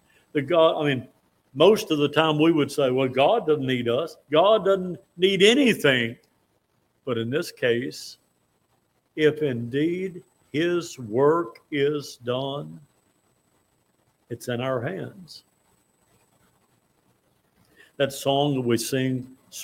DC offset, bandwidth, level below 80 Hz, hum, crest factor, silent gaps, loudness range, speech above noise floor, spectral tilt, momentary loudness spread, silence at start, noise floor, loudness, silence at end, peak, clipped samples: under 0.1%; 16.5 kHz; -68 dBFS; none; 22 dB; none; 13 LU; 46 dB; -5 dB/octave; 16 LU; 0.35 s; -69 dBFS; -23 LUFS; 0 s; -4 dBFS; under 0.1%